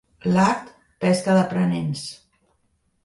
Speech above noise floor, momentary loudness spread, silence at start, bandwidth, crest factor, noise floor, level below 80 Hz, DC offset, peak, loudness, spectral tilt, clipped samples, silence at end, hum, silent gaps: 47 dB; 11 LU; 0.25 s; 11.5 kHz; 16 dB; -68 dBFS; -58 dBFS; under 0.1%; -6 dBFS; -21 LUFS; -6.5 dB/octave; under 0.1%; 0.9 s; none; none